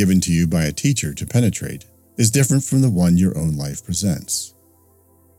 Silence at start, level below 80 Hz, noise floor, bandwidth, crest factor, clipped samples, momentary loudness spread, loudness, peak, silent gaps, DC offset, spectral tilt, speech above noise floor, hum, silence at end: 0 s; -42 dBFS; -54 dBFS; 16.5 kHz; 16 dB; under 0.1%; 11 LU; -19 LUFS; -2 dBFS; none; under 0.1%; -5.5 dB/octave; 36 dB; none; 0.9 s